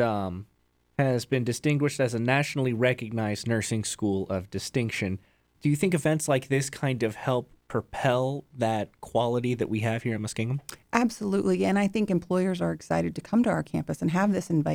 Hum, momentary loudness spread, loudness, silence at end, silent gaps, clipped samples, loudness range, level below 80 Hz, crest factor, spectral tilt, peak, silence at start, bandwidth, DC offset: none; 7 LU; -27 LUFS; 0 s; none; under 0.1%; 2 LU; -58 dBFS; 20 dB; -6 dB/octave; -6 dBFS; 0 s; 18.5 kHz; under 0.1%